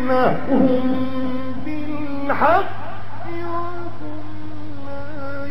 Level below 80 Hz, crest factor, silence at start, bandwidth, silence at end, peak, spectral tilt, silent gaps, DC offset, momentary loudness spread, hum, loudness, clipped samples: -48 dBFS; 20 dB; 0 s; 14 kHz; 0 s; -2 dBFS; -8.5 dB/octave; none; 10%; 17 LU; none; -22 LUFS; under 0.1%